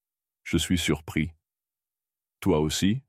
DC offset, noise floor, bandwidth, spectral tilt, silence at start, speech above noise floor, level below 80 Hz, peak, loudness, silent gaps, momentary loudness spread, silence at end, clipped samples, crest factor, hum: under 0.1%; under -90 dBFS; 16 kHz; -5 dB/octave; 0.45 s; over 65 dB; -48 dBFS; -10 dBFS; -27 LUFS; none; 8 LU; 0.1 s; under 0.1%; 18 dB; none